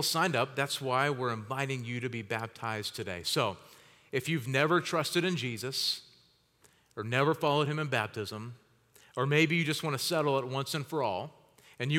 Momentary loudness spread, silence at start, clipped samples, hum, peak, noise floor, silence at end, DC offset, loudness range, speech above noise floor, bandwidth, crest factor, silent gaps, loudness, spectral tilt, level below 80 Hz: 11 LU; 0 s; under 0.1%; none; -12 dBFS; -66 dBFS; 0 s; under 0.1%; 3 LU; 35 dB; 17.5 kHz; 20 dB; none; -31 LUFS; -4.5 dB/octave; -78 dBFS